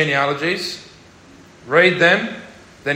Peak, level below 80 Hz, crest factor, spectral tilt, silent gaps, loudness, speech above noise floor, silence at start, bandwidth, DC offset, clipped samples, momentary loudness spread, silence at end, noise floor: -2 dBFS; -60 dBFS; 18 dB; -4.5 dB/octave; none; -16 LUFS; 28 dB; 0 s; 16 kHz; under 0.1%; under 0.1%; 17 LU; 0 s; -45 dBFS